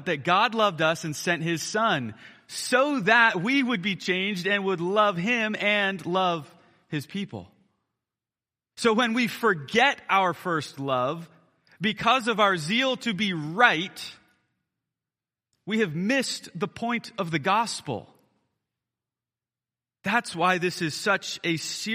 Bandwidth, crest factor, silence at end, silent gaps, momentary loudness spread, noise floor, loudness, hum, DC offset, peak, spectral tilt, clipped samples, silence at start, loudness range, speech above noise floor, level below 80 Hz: 15.5 kHz; 22 dB; 0 s; none; 13 LU; under -90 dBFS; -25 LUFS; none; under 0.1%; -4 dBFS; -4 dB/octave; under 0.1%; 0 s; 7 LU; over 65 dB; -72 dBFS